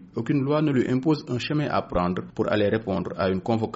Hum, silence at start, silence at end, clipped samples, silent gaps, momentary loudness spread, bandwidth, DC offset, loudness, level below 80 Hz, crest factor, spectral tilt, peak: none; 0 s; 0 s; under 0.1%; none; 4 LU; 8 kHz; under 0.1%; -25 LUFS; -48 dBFS; 14 dB; -6 dB/octave; -10 dBFS